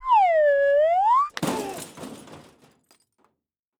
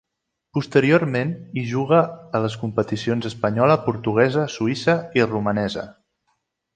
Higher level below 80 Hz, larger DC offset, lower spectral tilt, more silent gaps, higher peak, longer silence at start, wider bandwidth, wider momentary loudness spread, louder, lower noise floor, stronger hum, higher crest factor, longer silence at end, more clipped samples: about the same, -60 dBFS vs -56 dBFS; neither; second, -4 dB/octave vs -7 dB/octave; neither; second, -10 dBFS vs -2 dBFS; second, 0 s vs 0.55 s; first, 19 kHz vs 9.2 kHz; first, 20 LU vs 9 LU; about the same, -20 LUFS vs -21 LUFS; about the same, -80 dBFS vs -80 dBFS; neither; about the same, 14 dB vs 18 dB; first, 1.4 s vs 0.85 s; neither